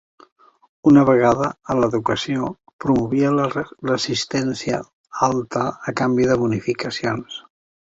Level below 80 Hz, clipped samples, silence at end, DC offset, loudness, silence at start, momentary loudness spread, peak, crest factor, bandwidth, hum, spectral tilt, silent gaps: -52 dBFS; under 0.1%; 0.5 s; under 0.1%; -20 LUFS; 0.85 s; 11 LU; -2 dBFS; 18 dB; 8 kHz; none; -6 dB/octave; 2.73-2.79 s, 4.93-5.04 s